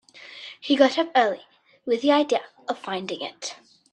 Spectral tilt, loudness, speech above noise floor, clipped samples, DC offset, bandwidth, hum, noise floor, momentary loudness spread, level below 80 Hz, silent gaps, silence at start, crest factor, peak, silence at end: -3.5 dB/octave; -23 LUFS; 20 dB; under 0.1%; under 0.1%; 10 kHz; none; -43 dBFS; 18 LU; -76 dBFS; none; 0.15 s; 22 dB; -4 dBFS; 0.4 s